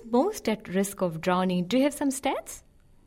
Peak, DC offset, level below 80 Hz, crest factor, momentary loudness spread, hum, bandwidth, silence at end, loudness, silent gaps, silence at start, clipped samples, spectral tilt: -12 dBFS; under 0.1%; -58 dBFS; 16 dB; 8 LU; none; 16 kHz; 0.45 s; -27 LUFS; none; 0 s; under 0.1%; -5 dB/octave